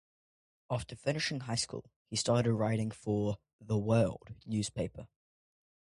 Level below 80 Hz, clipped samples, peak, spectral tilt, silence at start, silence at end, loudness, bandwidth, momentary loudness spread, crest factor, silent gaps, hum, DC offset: -60 dBFS; under 0.1%; -16 dBFS; -5.5 dB/octave; 0.7 s; 0.9 s; -34 LUFS; 11.5 kHz; 10 LU; 18 dB; 1.96-2.05 s, 3.53-3.59 s; none; under 0.1%